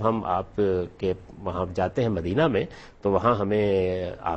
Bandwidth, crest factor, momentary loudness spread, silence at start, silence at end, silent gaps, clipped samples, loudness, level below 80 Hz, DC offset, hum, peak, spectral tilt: 8.4 kHz; 18 dB; 8 LU; 0 s; 0 s; none; under 0.1%; -26 LUFS; -48 dBFS; under 0.1%; none; -6 dBFS; -8 dB/octave